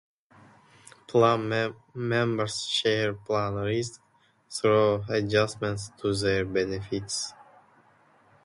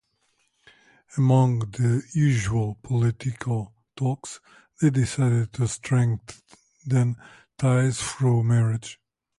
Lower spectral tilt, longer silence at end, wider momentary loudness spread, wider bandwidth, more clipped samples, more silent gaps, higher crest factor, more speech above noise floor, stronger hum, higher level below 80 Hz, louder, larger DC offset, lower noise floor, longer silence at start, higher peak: second, -4.5 dB/octave vs -6.5 dB/octave; first, 1 s vs 0.45 s; second, 10 LU vs 13 LU; about the same, 11.5 kHz vs 11.5 kHz; neither; neither; about the same, 20 dB vs 16 dB; second, 34 dB vs 47 dB; neither; about the same, -56 dBFS vs -52 dBFS; second, -27 LUFS vs -24 LUFS; neither; second, -61 dBFS vs -70 dBFS; about the same, 1.1 s vs 1.15 s; about the same, -8 dBFS vs -8 dBFS